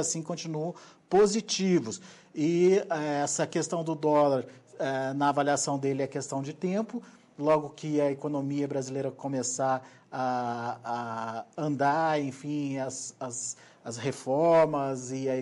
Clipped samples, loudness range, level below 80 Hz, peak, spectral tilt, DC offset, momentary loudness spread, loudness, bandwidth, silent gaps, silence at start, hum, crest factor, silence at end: under 0.1%; 4 LU; -72 dBFS; -14 dBFS; -5 dB/octave; under 0.1%; 12 LU; -29 LUFS; 11.5 kHz; none; 0 s; none; 14 dB; 0 s